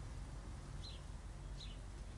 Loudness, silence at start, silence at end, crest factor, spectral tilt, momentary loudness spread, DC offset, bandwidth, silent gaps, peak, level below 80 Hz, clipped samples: -52 LUFS; 0 s; 0 s; 10 dB; -5 dB/octave; 2 LU; under 0.1%; 11.5 kHz; none; -38 dBFS; -52 dBFS; under 0.1%